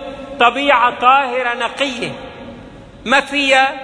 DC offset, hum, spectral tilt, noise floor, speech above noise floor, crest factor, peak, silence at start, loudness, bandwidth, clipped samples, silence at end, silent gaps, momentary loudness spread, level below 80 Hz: under 0.1%; none; -3 dB/octave; -36 dBFS; 22 dB; 16 dB; 0 dBFS; 0 s; -14 LUFS; 10.5 kHz; under 0.1%; 0 s; none; 19 LU; -48 dBFS